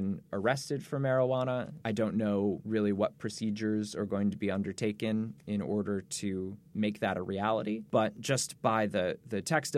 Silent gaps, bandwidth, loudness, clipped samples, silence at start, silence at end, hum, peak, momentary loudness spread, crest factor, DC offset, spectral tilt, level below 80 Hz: none; 14.5 kHz; -32 LUFS; under 0.1%; 0 s; 0 s; none; -14 dBFS; 6 LU; 18 dB; under 0.1%; -5.5 dB/octave; -70 dBFS